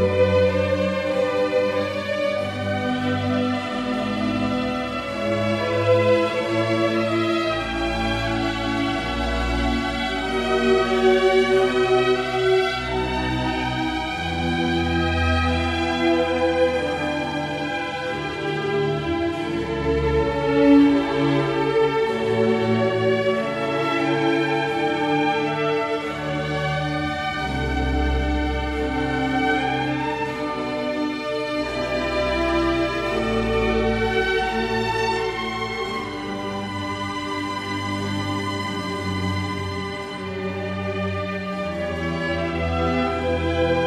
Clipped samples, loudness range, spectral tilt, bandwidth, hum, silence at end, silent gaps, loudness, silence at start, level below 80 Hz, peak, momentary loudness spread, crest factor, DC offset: under 0.1%; 7 LU; -6 dB/octave; 13.5 kHz; none; 0 s; none; -22 LUFS; 0 s; -36 dBFS; -4 dBFS; 7 LU; 18 dB; under 0.1%